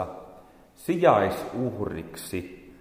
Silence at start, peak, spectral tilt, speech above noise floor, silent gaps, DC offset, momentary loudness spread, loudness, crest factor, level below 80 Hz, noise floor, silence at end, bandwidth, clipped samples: 0 s; -6 dBFS; -6 dB/octave; 26 dB; none; under 0.1%; 17 LU; -26 LUFS; 22 dB; -54 dBFS; -51 dBFS; 0.1 s; 16.5 kHz; under 0.1%